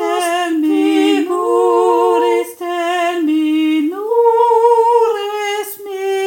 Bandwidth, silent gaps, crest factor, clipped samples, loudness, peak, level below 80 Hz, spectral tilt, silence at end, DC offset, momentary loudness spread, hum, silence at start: 17 kHz; none; 14 dB; under 0.1%; -14 LUFS; 0 dBFS; -74 dBFS; -2 dB/octave; 0 s; under 0.1%; 9 LU; none; 0 s